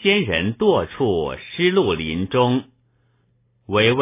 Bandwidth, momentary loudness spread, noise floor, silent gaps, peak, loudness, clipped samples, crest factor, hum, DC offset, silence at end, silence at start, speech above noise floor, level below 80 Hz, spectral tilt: 3.8 kHz; 6 LU; -63 dBFS; none; -4 dBFS; -20 LUFS; under 0.1%; 16 dB; none; under 0.1%; 0 s; 0 s; 44 dB; -44 dBFS; -10 dB/octave